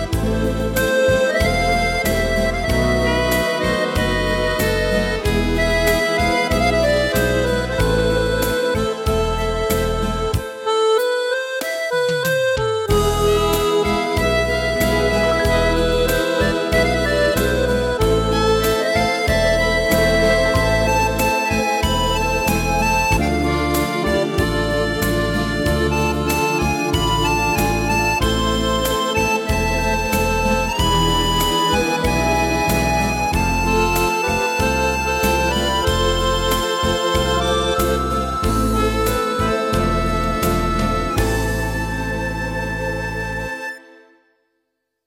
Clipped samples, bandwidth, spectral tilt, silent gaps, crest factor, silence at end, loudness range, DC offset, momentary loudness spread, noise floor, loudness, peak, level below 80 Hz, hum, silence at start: under 0.1%; 16.5 kHz; -4.5 dB/octave; none; 12 dB; 1.3 s; 3 LU; under 0.1%; 4 LU; -73 dBFS; -18 LUFS; -6 dBFS; -26 dBFS; none; 0 s